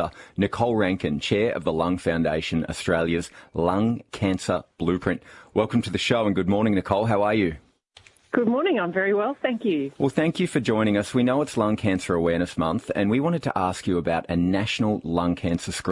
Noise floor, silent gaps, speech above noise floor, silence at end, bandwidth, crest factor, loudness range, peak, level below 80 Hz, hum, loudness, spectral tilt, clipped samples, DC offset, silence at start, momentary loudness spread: -55 dBFS; none; 31 dB; 0 s; 11.5 kHz; 18 dB; 2 LU; -4 dBFS; -52 dBFS; none; -24 LUFS; -6 dB/octave; under 0.1%; under 0.1%; 0 s; 5 LU